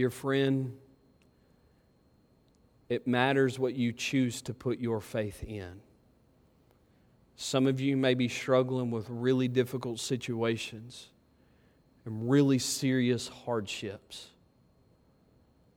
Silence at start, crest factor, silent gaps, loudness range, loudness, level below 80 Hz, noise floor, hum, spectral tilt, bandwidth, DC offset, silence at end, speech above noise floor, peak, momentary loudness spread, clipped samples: 0 s; 22 dB; none; 5 LU; -30 LUFS; -64 dBFS; -66 dBFS; none; -5.5 dB/octave; 16.5 kHz; under 0.1%; 1.5 s; 36 dB; -10 dBFS; 15 LU; under 0.1%